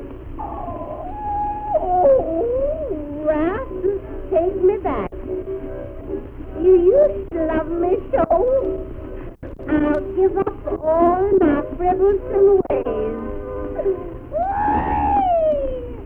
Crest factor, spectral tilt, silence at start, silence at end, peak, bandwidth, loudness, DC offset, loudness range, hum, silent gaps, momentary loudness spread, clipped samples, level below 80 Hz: 14 dB; -10.5 dB/octave; 0 s; 0 s; -4 dBFS; 3.5 kHz; -20 LUFS; under 0.1%; 4 LU; none; none; 15 LU; under 0.1%; -34 dBFS